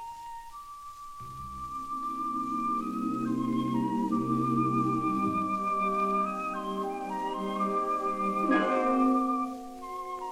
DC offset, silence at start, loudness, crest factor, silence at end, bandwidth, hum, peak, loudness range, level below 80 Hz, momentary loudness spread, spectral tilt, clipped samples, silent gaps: under 0.1%; 0 s; -30 LUFS; 16 dB; 0 s; 15.5 kHz; none; -14 dBFS; 4 LU; -58 dBFS; 16 LU; -7 dB/octave; under 0.1%; none